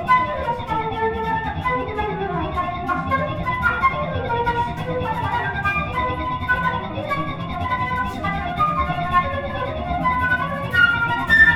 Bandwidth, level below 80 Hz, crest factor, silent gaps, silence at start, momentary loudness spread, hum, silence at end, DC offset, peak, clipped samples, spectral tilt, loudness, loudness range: 16 kHz; -36 dBFS; 18 dB; none; 0 s; 7 LU; none; 0 s; under 0.1%; -2 dBFS; under 0.1%; -6.5 dB/octave; -21 LUFS; 3 LU